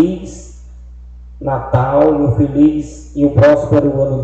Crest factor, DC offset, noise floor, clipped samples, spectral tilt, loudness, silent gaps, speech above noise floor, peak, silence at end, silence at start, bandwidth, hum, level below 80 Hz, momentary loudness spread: 14 dB; under 0.1%; -34 dBFS; under 0.1%; -9 dB/octave; -13 LUFS; none; 21 dB; 0 dBFS; 0 s; 0 s; 8.2 kHz; 60 Hz at -30 dBFS; -34 dBFS; 16 LU